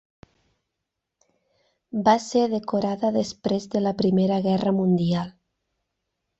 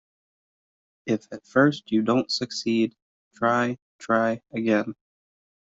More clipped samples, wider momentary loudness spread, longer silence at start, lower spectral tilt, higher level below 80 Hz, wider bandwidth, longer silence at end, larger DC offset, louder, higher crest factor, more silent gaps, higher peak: neither; about the same, 6 LU vs 8 LU; first, 1.95 s vs 1.05 s; first, -7 dB/octave vs -5.5 dB/octave; first, -60 dBFS vs -68 dBFS; about the same, 8 kHz vs 8 kHz; first, 1.1 s vs 0.65 s; neither; about the same, -23 LUFS vs -25 LUFS; about the same, 20 dB vs 22 dB; second, none vs 3.02-3.31 s, 3.82-3.99 s; about the same, -6 dBFS vs -4 dBFS